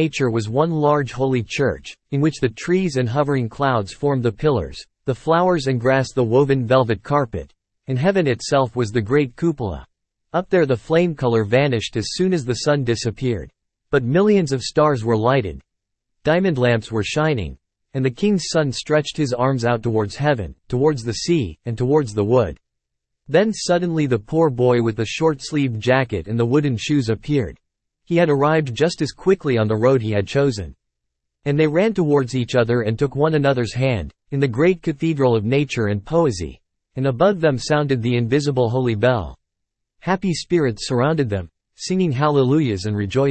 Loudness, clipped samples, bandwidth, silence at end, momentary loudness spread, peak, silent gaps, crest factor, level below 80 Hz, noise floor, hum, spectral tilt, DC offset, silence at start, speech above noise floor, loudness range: -19 LUFS; under 0.1%; 8.8 kHz; 0 s; 7 LU; -2 dBFS; none; 16 dB; -46 dBFS; -79 dBFS; none; -6.5 dB/octave; under 0.1%; 0 s; 60 dB; 2 LU